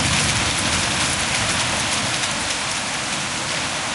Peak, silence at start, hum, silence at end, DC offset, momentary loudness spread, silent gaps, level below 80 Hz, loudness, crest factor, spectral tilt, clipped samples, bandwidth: -6 dBFS; 0 s; none; 0 s; under 0.1%; 4 LU; none; -42 dBFS; -19 LUFS; 16 dB; -2 dB/octave; under 0.1%; 11.5 kHz